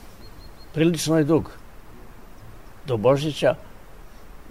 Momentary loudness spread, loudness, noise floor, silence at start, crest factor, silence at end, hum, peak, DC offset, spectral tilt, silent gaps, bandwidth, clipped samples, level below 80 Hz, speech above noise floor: 14 LU; -22 LUFS; -44 dBFS; 0.05 s; 18 dB; 0 s; none; -6 dBFS; 0.6%; -6 dB/octave; none; 16 kHz; under 0.1%; -46 dBFS; 23 dB